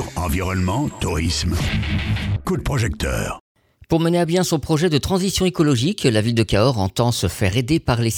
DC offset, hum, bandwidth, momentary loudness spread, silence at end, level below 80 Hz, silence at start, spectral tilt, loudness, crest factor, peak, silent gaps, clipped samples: under 0.1%; none; 19.5 kHz; 5 LU; 0 s; -32 dBFS; 0 s; -5.5 dB/octave; -20 LUFS; 18 dB; -2 dBFS; 3.40-3.55 s; under 0.1%